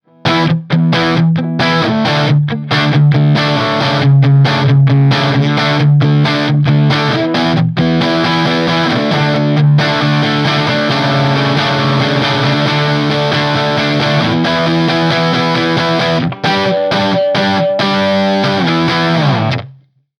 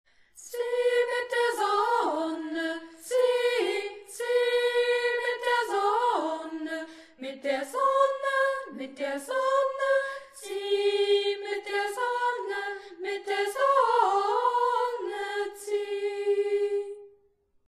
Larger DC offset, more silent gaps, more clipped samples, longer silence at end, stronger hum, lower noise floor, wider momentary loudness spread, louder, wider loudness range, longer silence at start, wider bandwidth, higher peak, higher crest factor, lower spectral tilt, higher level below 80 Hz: neither; neither; neither; second, 0.45 s vs 0.6 s; neither; second, -42 dBFS vs -67 dBFS; second, 3 LU vs 11 LU; first, -12 LUFS vs -27 LUFS; about the same, 2 LU vs 2 LU; about the same, 0.25 s vs 0.35 s; second, 7 kHz vs 13.5 kHz; first, 0 dBFS vs -10 dBFS; about the same, 12 dB vs 16 dB; first, -6.5 dB/octave vs -1 dB/octave; first, -48 dBFS vs -76 dBFS